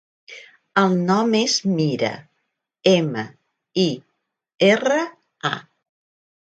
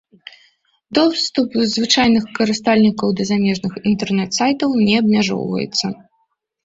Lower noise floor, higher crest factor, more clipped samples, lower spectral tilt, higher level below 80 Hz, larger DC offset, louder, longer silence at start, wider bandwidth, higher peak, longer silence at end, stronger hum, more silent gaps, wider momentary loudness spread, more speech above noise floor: first, -75 dBFS vs -67 dBFS; first, 22 dB vs 16 dB; neither; about the same, -5 dB/octave vs -4.5 dB/octave; second, -66 dBFS vs -52 dBFS; neither; second, -20 LUFS vs -17 LUFS; second, 0.3 s vs 0.9 s; first, 9 kHz vs 7.8 kHz; about the same, 0 dBFS vs -2 dBFS; about the same, 0.8 s vs 0.7 s; neither; neither; first, 18 LU vs 7 LU; first, 56 dB vs 50 dB